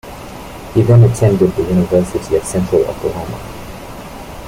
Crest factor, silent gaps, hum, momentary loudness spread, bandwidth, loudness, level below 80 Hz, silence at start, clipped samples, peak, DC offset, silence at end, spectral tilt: 14 dB; none; none; 21 LU; 15.5 kHz; -14 LUFS; -36 dBFS; 0.05 s; under 0.1%; -2 dBFS; under 0.1%; 0 s; -7.5 dB/octave